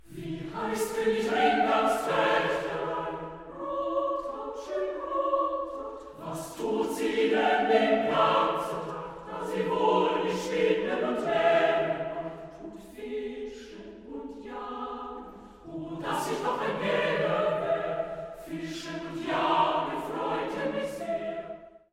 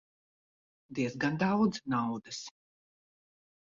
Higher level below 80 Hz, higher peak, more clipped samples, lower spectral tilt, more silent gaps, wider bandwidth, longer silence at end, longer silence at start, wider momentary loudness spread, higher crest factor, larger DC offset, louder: first, -60 dBFS vs -72 dBFS; first, -12 dBFS vs -16 dBFS; neither; about the same, -5 dB/octave vs -5.5 dB/octave; neither; first, 16 kHz vs 7.6 kHz; second, 0.15 s vs 1.3 s; second, 0.05 s vs 0.9 s; about the same, 16 LU vs 14 LU; about the same, 18 dB vs 18 dB; neither; first, -29 LUFS vs -32 LUFS